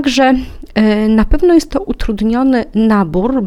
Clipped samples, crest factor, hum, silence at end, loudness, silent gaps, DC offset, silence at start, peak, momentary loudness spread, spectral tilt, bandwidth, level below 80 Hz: under 0.1%; 12 dB; none; 0 s; -13 LUFS; none; under 0.1%; 0 s; 0 dBFS; 8 LU; -6 dB/octave; 12.5 kHz; -24 dBFS